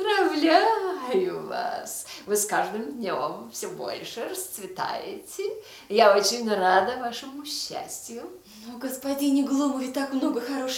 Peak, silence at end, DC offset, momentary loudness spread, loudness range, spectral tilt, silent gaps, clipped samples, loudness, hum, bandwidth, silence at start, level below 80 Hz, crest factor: -4 dBFS; 0 s; under 0.1%; 15 LU; 5 LU; -2.5 dB/octave; none; under 0.1%; -26 LUFS; none; 18 kHz; 0 s; -70 dBFS; 22 dB